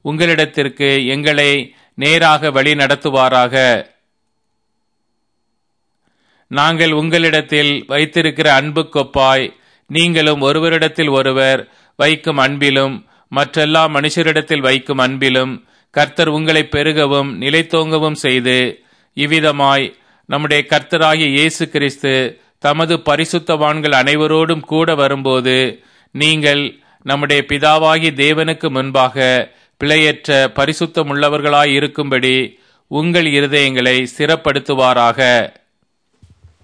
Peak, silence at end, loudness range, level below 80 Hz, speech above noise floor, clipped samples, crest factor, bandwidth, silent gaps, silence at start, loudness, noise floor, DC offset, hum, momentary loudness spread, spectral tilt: 0 dBFS; 1.15 s; 2 LU; -50 dBFS; 58 dB; under 0.1%; 14 dB; 11 kHz; none; 0.05 s; -13 LUFS; -71 dBFS; under 0.1%; none; 7 LU; -4.5 dB/octave